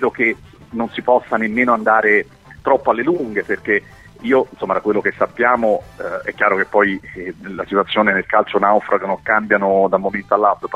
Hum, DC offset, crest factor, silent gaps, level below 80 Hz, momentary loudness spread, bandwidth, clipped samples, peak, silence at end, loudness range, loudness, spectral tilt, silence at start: none; under 0.1%; 16 dB; none; -52 dBFS; 11 LU; 10.5 kHz; under 0.1%; 0 dBFS; 0 s; 2 LU; -17 LUFS; -6.5 dB/octave; 0 s